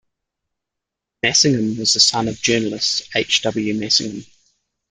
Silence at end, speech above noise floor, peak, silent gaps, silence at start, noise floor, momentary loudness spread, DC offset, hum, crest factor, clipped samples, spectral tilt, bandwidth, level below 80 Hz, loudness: 0.7 s; 65 dB; 0 dBFS; none; 1.25 s; -83 dBFS; 8 LU; under 0.1%; none; 20 dB; under 0.1%; -2.5 dB/octave; 11.5 kHz; -56 dBFS; -17 LUFS